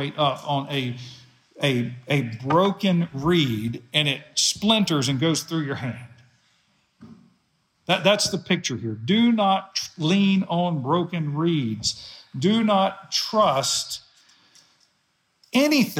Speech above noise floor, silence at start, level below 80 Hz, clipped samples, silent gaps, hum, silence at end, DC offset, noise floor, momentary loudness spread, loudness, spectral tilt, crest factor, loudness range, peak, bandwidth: 47 dB; 0 s; -62 dBFS; under 0.1%; none; none; 0 s; under 0.1%; -69 dBFS; 10 LU; -22 LUFS; -4.5 dB/octave; 20 dB; 4 LU; -4 dBFS; 17 kHz